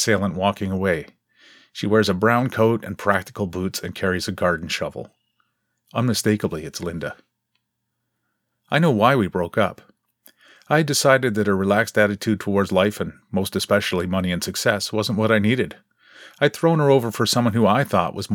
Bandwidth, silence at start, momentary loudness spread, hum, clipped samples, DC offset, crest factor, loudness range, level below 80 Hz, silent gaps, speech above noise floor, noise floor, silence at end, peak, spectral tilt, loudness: 18.5 kHz; 0 s; 10 LU; none; under 0.1%; under 0.1%; 22 dB; 5 LU; -54 dBFS; none; 57 dB; -77 dBFS; 0 s; 0 dBFS; -5 dB/octave; -21 LUFS